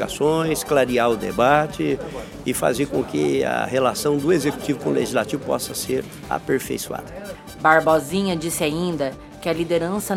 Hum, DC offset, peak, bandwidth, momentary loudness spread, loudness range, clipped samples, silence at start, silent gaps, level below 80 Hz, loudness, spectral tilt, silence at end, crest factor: none; under 0.1%; 0 dBFS; 17 kHz; 10 LU; 2 LU; under 0.1%; 0 s; none; -48 dBFS; -21 LUFS; -4.5 dB/octave; 0 s; 20 dB